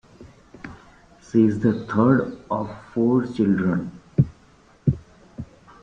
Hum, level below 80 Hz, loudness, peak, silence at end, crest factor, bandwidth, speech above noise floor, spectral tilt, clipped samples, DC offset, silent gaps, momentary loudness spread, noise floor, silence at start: none; -50 dBFS; -22 LUFS; -4 dBFS; 0.4 s; 18 dB; 7.6 kHz; 33 dB; -9.5 dB/octave; under 0.1%; under 0.1%; none; 22 LU; -54 dBFS; 0.2 s